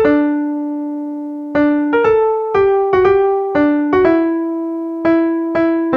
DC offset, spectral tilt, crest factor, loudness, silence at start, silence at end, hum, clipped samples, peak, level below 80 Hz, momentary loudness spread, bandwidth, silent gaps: under 0.1%; -8 dB/octave; 14 dB; -15 LUFS; 0 s; 0 s; none; under 0.1%; -2 dBFS; -46 dBFS; 9 LU; 5.6 kHz; none